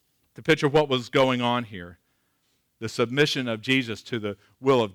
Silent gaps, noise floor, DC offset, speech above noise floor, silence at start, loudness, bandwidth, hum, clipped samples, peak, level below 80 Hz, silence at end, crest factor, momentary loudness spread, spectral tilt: none; -71 dBFS; under 0.1%; 47 dB; 0.4 s; -24 LUFS; 18.5 kHz; none; under 0.1%; -10 dBFS; -62 dBFS; 0 s; 16 dB; 14 LU; -5 dB/octave